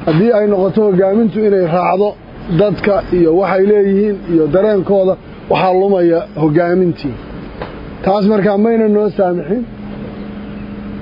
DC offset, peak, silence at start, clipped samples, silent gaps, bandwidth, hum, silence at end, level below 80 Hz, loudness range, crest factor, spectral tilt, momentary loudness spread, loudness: under 0.1%; 0 dBFS; 0 s; under 0.1%; none; 5.4 kHz; none; 0 s; -38 dBFS; 3 LU; 12 dB; -10.5 dB/octave; 16 LU; -13 LUFS